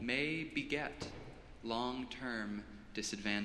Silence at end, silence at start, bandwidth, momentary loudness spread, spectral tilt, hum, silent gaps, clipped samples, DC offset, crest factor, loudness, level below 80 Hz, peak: 0 s; 0 s; 13 kHz; 11 LU; -4 dB/octave; none; none; under 0.1%; under 0.1%; 20 dB; -40 LUFS; -60 dBFS; -20 dBFS